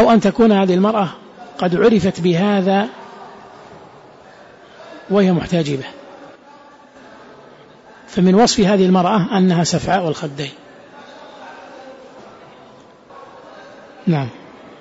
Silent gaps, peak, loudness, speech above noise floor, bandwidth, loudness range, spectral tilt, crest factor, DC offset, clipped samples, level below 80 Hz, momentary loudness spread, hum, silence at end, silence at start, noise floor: none; -4 dBFS; -16 LUFS; 29 dB; 8 kHz; 13 LU; -6 dB/octave; 14 dB; under 0.1%; under 0.1%; -50 dBFS; 25 LU; none; 0.45 s; 0 s; -44 dBFS